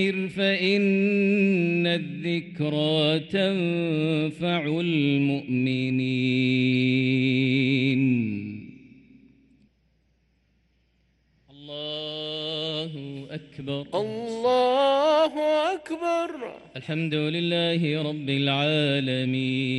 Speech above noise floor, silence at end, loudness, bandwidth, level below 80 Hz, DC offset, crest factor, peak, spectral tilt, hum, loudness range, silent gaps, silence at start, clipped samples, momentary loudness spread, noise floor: 43 dB; 0 s; -24 LUFS; 11 kHz; -66 dBFS; under 0.1%; 14 dB; -10 dBFS; -7 dB/octave; none; 10 LU; none; 0 s; under 0.1%; 11 LU; -67 dBFS